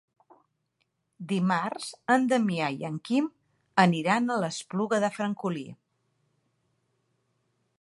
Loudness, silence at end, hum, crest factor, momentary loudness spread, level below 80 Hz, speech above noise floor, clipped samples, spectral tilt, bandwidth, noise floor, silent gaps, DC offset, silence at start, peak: -27 LUFS; 2.05 s; none; 24 dB; 12 LU; -76 dBFS; 50 dB; under 0.1%; -5.5 dB/octave; 11.5 kHz; -77 dBFS; none; under 0.1%; 1.2 s; -6 dBFS